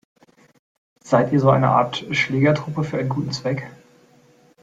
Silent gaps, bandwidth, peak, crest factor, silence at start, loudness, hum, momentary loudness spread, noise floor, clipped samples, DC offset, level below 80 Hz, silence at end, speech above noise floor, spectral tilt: none; 7.8 kHz; -2 dBFS; 18 dB; 1.05 s; -20 LUFS; none; 9 LU; -54 dBFS; under 0.1%; under 0.1%; -58 dBFS; 0.9 s; 35 dB; -6.5 dB/octave